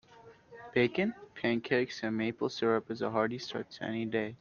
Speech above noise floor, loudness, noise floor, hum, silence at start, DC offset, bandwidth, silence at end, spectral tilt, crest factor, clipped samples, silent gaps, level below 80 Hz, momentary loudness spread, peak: 25 dB; -33 LUFS; -57 dBFS; none; 0.1 s; under 0.1%; 7.2 kHz; 0.05 s; -6 dB/octave; 20 dB; under 0.1%; none; -72 dBFS; 8 LU; -14 dBFS